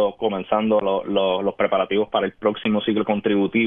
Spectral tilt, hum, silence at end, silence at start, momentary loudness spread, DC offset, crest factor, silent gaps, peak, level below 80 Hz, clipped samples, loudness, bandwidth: -9.5 dB/octave; none; 0 s; 0 s; 3 LU; under 0.1%; 16 dB; none; -6 dBFS; -58 dBFS; under 0.1%; -21 LUFS; 3.8 kHz